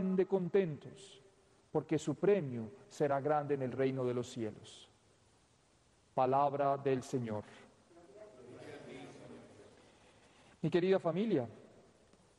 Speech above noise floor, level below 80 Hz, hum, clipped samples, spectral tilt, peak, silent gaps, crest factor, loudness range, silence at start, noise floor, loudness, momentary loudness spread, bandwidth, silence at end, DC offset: 35 dB; -76 dBFS; none; under 0.1%; -7 dB/octave; -20 dBFS; none; 18 dB; 8 LU; 0 s; -70 dBFS; -35 LUFS; 23 LU; 11 kHz; 0.75 s; under 0.1%